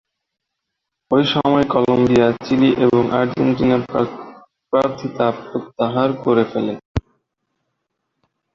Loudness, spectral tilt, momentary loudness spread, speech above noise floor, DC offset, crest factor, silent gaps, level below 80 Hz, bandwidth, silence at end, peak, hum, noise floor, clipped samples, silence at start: -18 LUFS; -7.5 dB/octave; 10 LU; 62 dB; under 0.1%; 16 dB; 6.85-6.95 s; -44 dBFS; 7.2 kHz; 1.55 s; -2 dBFS; none; -79 dBFS; under 0.1%; 1.1 s